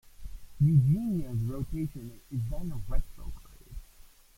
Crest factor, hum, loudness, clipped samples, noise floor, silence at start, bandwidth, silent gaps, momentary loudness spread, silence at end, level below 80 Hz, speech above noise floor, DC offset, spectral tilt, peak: 16 dB; none; -30 LUFS; under 0.1%; -54 dBFS; 0.05 s; 16.5 kHz; none; 26 LU; 0.3 s; -40 dBFS; 26 dB; under 0.1%; -9.5 dB/octave; -14 dBFS